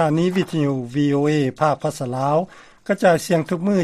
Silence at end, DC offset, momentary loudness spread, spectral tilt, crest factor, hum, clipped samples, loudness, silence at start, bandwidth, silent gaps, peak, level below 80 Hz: 0 s; under 0.1%; 7 LU; -6.5 dB/octave; 16 dB; none; under 0.1%; -20 LUFS; 0 s; 14.5 kHz; none; -4 dBFS; -58 dBFS